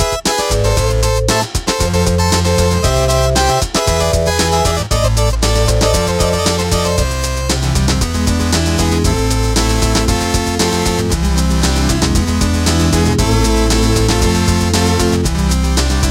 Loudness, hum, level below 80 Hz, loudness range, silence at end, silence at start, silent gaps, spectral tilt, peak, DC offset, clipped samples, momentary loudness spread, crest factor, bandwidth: -14 LUFS; none; -18 dBFS; 1 LU; 0 s; 0 s; none; -4.5 dB/octave; -2 dBFS; under 0.1%; under 0.1%; 3 LU; 12 dB; 16.5 kHz